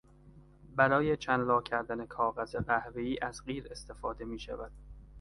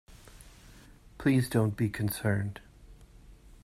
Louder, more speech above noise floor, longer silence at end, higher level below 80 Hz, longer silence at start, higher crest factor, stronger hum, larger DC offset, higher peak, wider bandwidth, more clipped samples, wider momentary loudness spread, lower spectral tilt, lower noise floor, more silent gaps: second, -33 LUFS vs -30 LUFS; about the same, 24 dB vs 26 dB; second, 0 s vs 0.3 s; about the same, -54 dBFS vs -54 dBFS; first, 0.25 s vs 0.1 s; about the same, 24 dB vs 20 dB; neither; neither; about the same, -10 dBFS vs -12 dBFS; second, 11.5 kHz vs 16 kHz; neither; first, 14 LU vs 9 LU; about the same, -6 dB/octave vs -6.5 dB/octave; about the same, -57 dBFS vs -54 dBFS; neither